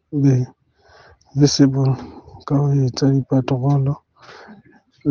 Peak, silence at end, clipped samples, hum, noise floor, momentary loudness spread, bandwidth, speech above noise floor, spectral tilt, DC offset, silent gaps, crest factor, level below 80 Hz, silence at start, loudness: -2 dBFS; 0 s; under 0.1%; none; -51 dBFS; 14 LU; 7.2 kHz; 35 dB; -7 dB/octave; under 0.1%; none; 18 dB; -54 dBFS; 0.1 s; -18 LUFS